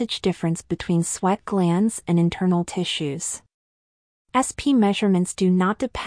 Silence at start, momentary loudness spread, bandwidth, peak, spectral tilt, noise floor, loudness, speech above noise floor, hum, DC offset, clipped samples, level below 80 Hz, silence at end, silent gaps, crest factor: 0 s; 7 LU; 10.5 kHz; -6 dBFS; -5.5 dB/octave; under -90 dBFS; -22 LUFS; over 69 dB; none; under 0.1%; under 0.1%; -50 dBFS; 0 s; 3.54-4.25 s; 16 dB